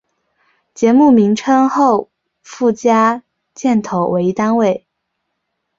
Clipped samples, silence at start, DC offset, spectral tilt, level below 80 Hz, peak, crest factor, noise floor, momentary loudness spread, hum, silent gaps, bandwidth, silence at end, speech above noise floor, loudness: under 0.1%; 0.8 s; under 0.1%; -6.5 dB/octave; -58 dBFS; -2 dBFS; 14 dB; -73 dBFS; 8 LU; none; none; 7.6 kHz; 1 s; 60 dB; -14 LUFS